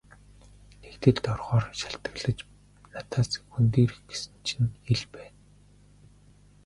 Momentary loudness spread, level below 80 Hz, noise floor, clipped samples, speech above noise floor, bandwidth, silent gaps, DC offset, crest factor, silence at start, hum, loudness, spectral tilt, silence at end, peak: 19 LU; -52 dBFS; -56 dBFS; under 0.1%; 29 dB; 11.5 kHz; none; under 0.1%; 24 dB; 0.85 s; 50 Hz at -50 dBFS; -28 LUFS; -6 dB/octave; 1.35 s; -4 dBFS